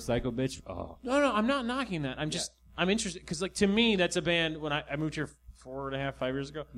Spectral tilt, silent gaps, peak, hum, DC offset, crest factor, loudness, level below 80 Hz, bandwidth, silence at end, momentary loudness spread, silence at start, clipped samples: -4.5 dB/octave; none; -12 dBFS; none; under 0.1%; 20 dB; -31 LUFS; -52 dBFS; 13.5 kHz; 0 s; 12 LU; 0 s; under 0.1%